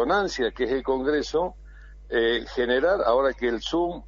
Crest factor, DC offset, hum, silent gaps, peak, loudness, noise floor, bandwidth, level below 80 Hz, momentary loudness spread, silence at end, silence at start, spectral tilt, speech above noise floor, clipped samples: 16 dB; under 0.1%; none; none; -8 dBFS; -24 LUFS; -44 dBFS; 7.6 kHz; -44 dBFS; 6 LU; 0 s; 0 s; -4.5 dB/octave; 20 dB; under 0.1%